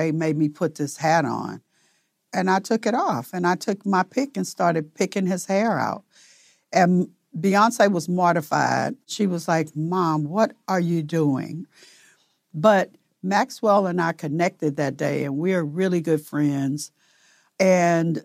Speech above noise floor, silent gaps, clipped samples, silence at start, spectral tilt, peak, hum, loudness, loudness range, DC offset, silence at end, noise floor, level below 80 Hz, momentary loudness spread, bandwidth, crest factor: 45 dB; none; under 0.1%; 0 s; -6 dB/octave; -4 dBFS; none; -22 LUFS; 3 LU; under 0.1%; 0.05 s; -67 dBFS; -76 dBFS; 9 LU; 16 kHz; 18 dB